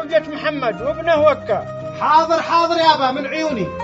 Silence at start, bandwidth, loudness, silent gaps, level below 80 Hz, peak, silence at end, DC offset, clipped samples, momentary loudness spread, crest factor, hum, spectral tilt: 0 s; 8 kHz; -17 LUFS; none; -50 dBFS; 0 dBFS; 0 s; under 0.1%; under 0.1%; 8 LU; 16 dB; none; -2.5 dB/octave